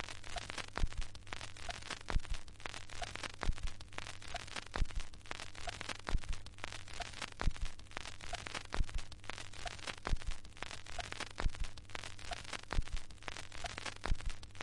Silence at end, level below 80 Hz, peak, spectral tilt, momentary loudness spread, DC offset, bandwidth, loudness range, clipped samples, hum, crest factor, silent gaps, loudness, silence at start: 0 s; -44 dBFS; -18 dBFS; -3.5 dB/octave; 6 LU; under 0.1%; 11.5 kHz; 1 LU; under 0.1%; none; 22 dB; none; -45 LUFS; 0 s